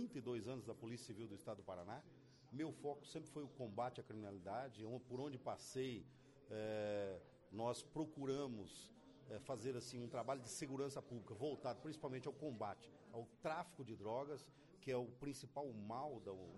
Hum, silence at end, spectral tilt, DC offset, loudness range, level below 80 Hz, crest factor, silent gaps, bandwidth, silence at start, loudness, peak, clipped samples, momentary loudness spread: none; 0 s; -5.5 dB/octave; under 0.1%; 3 LU; -80 dBFS; 18 dB; none; 11.5 kHz; 0 s; -50 LUFS; -32 dBFS; under 0.1%; 9 LU